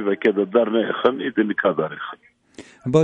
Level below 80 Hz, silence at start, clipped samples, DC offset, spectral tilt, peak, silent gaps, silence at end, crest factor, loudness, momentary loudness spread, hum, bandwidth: -62 dBFS; 0 s; under 0.1%; under 0.1%; -7 dB/octave; -2 dBFS; none; 0 s; 18 dB; -21 LUFS; 13 LU; none; 9 kHz